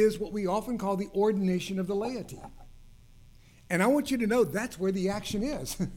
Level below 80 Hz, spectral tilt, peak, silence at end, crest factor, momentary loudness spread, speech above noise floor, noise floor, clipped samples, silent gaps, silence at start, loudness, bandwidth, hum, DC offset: -50 dBFS; -5.5 dB/octave; -14 dBFS; 0 s; 16 dB; 8 LU; 25 dB; -54 dBFS; under 0.1%; none; 0 s; -29 LUFS; 17.5 kHz; none; under 0.1%